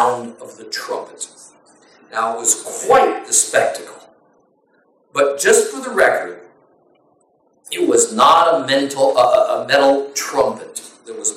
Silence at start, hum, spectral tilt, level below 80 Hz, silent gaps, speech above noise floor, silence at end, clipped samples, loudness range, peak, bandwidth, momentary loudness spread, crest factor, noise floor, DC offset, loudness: 0 s; none; -1.5 dB/octave; -60 dBFS; none; 43 dB; 0 s; under 0.1%; 4 LU; -2 dBFS; 16.5 kHz; 18 LU; 16 dB; -59 dBFS; under 0.1%; -16 LUFS